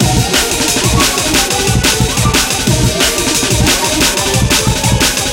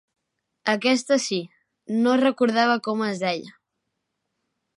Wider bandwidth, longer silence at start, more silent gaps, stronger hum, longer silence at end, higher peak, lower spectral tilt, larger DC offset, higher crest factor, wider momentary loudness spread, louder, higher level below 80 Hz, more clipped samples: first, 17.5 kHz vs 11.5 kHz; second, 0 s vs 0.65 s; neither; neither; second, 0 s vs 1.25 s; first, 0 dBFS vs -6 dBFS; about the same, -3 dB/octave vs -4 dB/octave; neither; second, 12 dB vs 18 dB; second, 2 LU vs 10 LU; first, -11 LUFS vs -23 LUFS; first, -22 dBFS vs -80 dBFS; neither